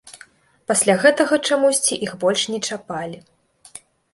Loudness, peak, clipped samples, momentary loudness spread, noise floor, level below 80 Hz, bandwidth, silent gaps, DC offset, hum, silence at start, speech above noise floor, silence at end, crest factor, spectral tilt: -19 LUFS; -2 dBFS; under 0.1%; 14 LU; -50 dBFS; -66 dBFS; 12 kHz; none; under 0.1%; none; 0.05 s; 31 dB; 0.35 s; 20 dB; -2.5 dB/octave